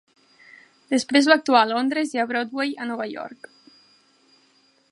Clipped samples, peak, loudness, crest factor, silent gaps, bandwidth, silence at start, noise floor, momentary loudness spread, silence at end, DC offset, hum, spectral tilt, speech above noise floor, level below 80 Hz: under 0.1%; -2 dBFS; -21 LUFS; 22 dB; none; 11.5 kHz; 0.9 s; -61 dBFS; 14 LU; 1.6 s; under 0.1%; none; -2.5 dB/octave; 40 dB; -78 dBFS